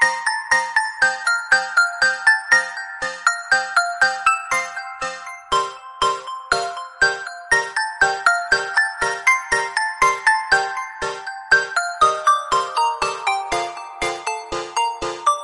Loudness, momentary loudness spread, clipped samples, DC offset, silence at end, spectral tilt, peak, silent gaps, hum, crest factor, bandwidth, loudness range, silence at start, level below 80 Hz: -19 LUFS; 11 LU; under 0.1%; under 0.1%; 0 s; -0.5 dB/octave; -2 dBFS; none; none; 18 dB; 11.5 kHz; 4 LU; 0 s; -50 dBFS